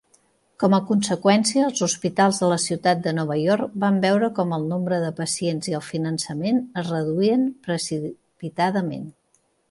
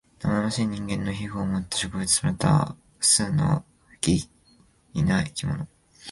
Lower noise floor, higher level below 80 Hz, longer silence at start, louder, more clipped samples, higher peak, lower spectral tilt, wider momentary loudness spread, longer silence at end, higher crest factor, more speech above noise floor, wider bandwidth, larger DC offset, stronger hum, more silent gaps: first, -66 dBFS vs -59 dBFS; second, -66 dBFS vs -46 dBFS; first, 0.6 s vs 0.2 s; first, -22 LUFS vs -25 LUFS; neither; about the same, -6 dBFS vs -6 dBFS; about the same, -5 dB/octave vs -4 dB/octave; second, 8 LU vs 12 LU; first, 0.6 s vs 0 s; about the same, 16 dB vs 20 dB; first, 44 dB vs 35 dB; about the same, 11.5 kHz vs 11.5 kHz; neither; neither; neither